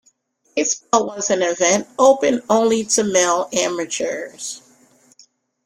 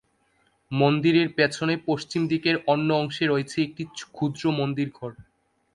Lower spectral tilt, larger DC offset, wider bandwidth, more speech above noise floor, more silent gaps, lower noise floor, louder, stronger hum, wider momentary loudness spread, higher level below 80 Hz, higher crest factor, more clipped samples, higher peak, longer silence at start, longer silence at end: second, -2.5 dB/octave vs -6 dB/octave; neither; first, 14.5 kHz vs 11.5 kHz; about the same, 42 dB vs 43 dB; neither; second, -60 dBFS vs -67 dBFS; first, -18 LUFS vs -24 LUFS; neither; about the same, 12 LU vs 11 LU; about the same, -62 dBFS vs -62 dBFS; about the same, 18 dB vs 18 dB; neither; first, -2 dBFS vs -6 dBFS; second, 0.55 s vs 0.7 s; first, 1.05 s vs 0.55 s